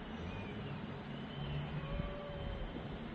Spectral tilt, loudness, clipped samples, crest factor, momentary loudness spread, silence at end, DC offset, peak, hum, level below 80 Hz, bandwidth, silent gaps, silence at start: -8 dB/octave; -44 LUFS; under 0.1%; 16 dB; 4 LU; 0 s; under 0.1%; -26 dBFS; none; -50 dBFS; 6.8 kHz; none; 0 s